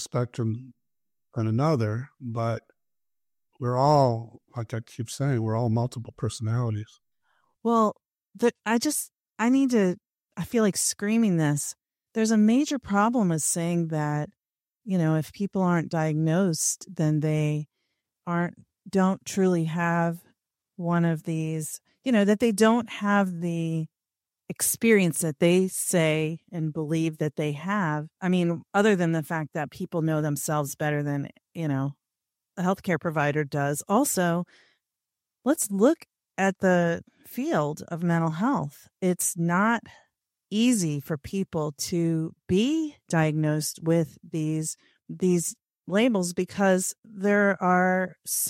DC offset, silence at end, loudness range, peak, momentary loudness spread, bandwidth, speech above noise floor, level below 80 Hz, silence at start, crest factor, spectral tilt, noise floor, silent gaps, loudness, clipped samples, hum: under 0.1%; 0 s; 4 LU; -8 dBFS; 11 LU; 16 kHz; over 65 dB; -64 dBFS; 0 s; 18 dB; -5.5 dB/octave; under -90 dBFS; 46.99-47.03 s; -26 LUFS; under 0.1%; none